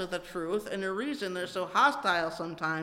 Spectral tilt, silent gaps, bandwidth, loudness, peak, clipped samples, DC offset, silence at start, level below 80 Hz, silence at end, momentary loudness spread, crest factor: -4 dB/octave; none; 16.5 kHz; -30 LUFS; -12 dBFS; under 0.1%; under 0.1%; 0 s; -64 dBFS; 0 s; 10 LU; 18 dB